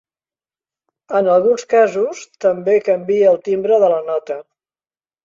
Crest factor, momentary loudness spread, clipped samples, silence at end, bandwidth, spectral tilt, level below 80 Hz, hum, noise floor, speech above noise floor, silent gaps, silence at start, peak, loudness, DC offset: 14 dB; 9 LU; under 0.1%; 0.85 s; 7.6 kHz; -5.5 dB/octave; -66 dBFS; none; under -90 dBFS; over 75 dB; none; 1.1 s; -2 dBFS; -16 LUFS; under 0.1%